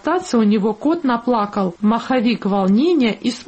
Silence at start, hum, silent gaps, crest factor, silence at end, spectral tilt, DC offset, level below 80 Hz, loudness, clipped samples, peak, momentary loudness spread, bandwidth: 0.05 s; none; none; 10 dB; 0.05 s; -6.5 dB/octave; under 0.1%; -56 dBFS; -17 LUFS; under 0.1%; -6 dBFS; 4 LU; 8.6 kHz